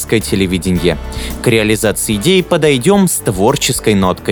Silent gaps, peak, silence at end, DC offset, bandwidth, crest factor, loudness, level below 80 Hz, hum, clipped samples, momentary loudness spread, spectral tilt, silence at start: none; 0 dBFS; 0 s; under 0.1%; over 20 kHz; 12 dB; -13 LUFS; -30 dBFS; none; under 0.1%; 4 LU; -4.5 dB/octave; 0 s